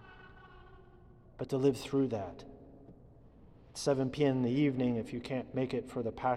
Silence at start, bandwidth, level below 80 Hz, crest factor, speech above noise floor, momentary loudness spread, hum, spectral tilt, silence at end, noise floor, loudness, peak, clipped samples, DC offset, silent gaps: 0 s; 13 kHz; -60 dBFS; 18 dB; 25 dB; 23 LU; none; -6.5 dB/octave; 0 s; -57 dBFS; -33 LUFS; -16 dBFS; under 0.1%; under 0.1%; none